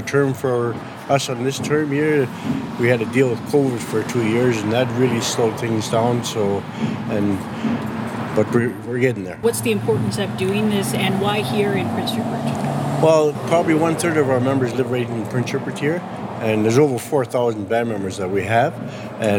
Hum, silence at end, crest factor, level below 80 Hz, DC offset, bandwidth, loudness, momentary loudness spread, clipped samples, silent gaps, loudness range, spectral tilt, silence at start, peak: none; 0 s; 18 dB; -56 dBFS; under 0.1%; 18 kHz; -20 LUFS; 6 LU; under 0.1%; none; 3 LU; -5.5 dB/octave; 0 s; -2 dBFS